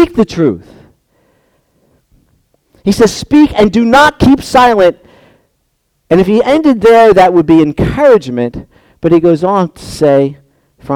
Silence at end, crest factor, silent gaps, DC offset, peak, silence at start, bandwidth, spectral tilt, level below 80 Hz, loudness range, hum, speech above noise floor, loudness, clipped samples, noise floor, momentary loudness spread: 0 s; 10 dB; none; under 0.1%; 0 dBFS; 0 s; 16.5 kHz; -6 dB/octave; -34 dBFS; 5 LU; none; 54 dB; -9 LUFS; 0.3%; -61 dBFS; 11 LU